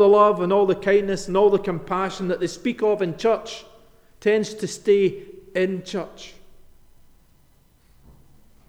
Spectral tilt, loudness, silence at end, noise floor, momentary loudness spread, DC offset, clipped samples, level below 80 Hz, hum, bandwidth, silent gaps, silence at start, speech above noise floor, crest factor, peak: -5.5 dB/octave; -22 LUFS; 2.4 s; -56 dBFS; 13 LU; under 0.1%; under 0.1%; -52 dBFS; none; 11 kHz; none; 0 s; 36 dB; 18 dB; -4 dBFS